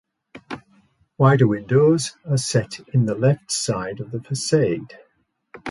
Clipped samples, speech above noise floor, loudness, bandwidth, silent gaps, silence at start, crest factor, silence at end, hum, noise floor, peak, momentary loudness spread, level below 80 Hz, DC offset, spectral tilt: under 0.1%; 39 dB; -20 LUFS; 11.5 kHz; none; 0.35 s; 18 dB; 0 s; none; -59 dBFS; -4 dBFS; 18 LU; -56 dBFS; under 0.1%; -5.5 dB/octave